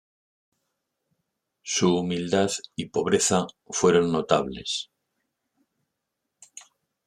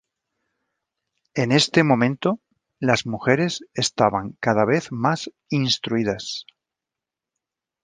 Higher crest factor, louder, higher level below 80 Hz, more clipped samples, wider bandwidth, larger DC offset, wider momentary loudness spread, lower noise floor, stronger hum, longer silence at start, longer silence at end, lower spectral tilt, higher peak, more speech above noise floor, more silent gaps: about the same, 24 dB vs 22 dB; second, -24 LUFS vs -21 LUFS; about the same, -62 dBFS vs -58 dBFS; neither; first, 14 kHz vs 10 kHz; neither; about the same, 10 LU vs 11 LU; second, -82 dBFS vs -87 dBFS; neither; first, 1.65 s vs 1.35 s; second, 0.45 s vs 1.4 s; about the same, -4 dB/octave vs -5 dB/octave; about the same, -4 dBFS vs -2 dBFS; second, 58 dB vs 66 dB; neither